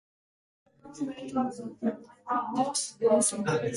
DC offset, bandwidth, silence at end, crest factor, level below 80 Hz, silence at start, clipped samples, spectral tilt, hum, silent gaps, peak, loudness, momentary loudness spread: under 0.1%; 11.5 kHz; 0 s; 20 dB; -70 dBFS; 0.85 s; under 0.1%; -4 dB/octave; none; none; -12 dBFS; -29 LUFS; 13 LU